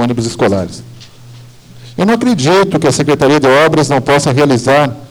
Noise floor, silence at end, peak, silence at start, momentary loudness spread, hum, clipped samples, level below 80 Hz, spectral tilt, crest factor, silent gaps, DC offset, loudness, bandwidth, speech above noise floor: -35 dBFS; 0.05 s; -2 dBFS; 0 s; 8 LU; none; under 0.1%; -44 dBFS; -5.5 dB/octave; 8 dB; none; under 0.1%; -10 LUFS; over 20 kHz; 25 dB